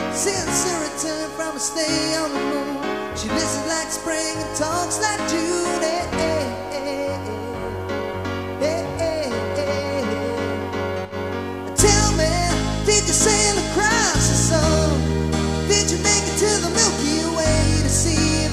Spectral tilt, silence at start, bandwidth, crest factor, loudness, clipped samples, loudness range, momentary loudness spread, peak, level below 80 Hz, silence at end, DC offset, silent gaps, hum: -3.5 dB/octave; 0 s; 15.5 kHz; 20 dB; -20 LUFS; under 0.1%; 7 LU; 10 LU; 0 dBFS; -32 dBFS; 0 s; 0.2%; none; none